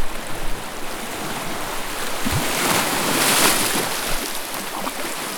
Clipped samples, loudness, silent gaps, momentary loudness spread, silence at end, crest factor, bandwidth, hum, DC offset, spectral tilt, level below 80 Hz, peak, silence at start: under 0.1%; -21 LUFS; none; 14 LU; 0 s; 20 dB; over 20 kHz; none; under 0.1%; -2 dB/octave; -34 dBFS; -2 dBFS; 0 s